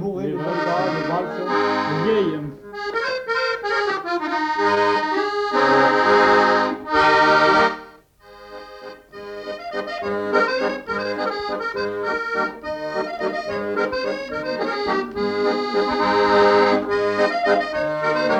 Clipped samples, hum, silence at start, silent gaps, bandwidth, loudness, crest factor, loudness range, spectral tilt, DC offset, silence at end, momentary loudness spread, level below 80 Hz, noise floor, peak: under 0.1%; none; 0 s; none; 9.2 kHz; -20 LUFS; 14 dB; 8 LU; -5 dB/octave; under 0.1%; 0 s; 14 LU; -54 dBFS; -47 dBFS; -6 dBFS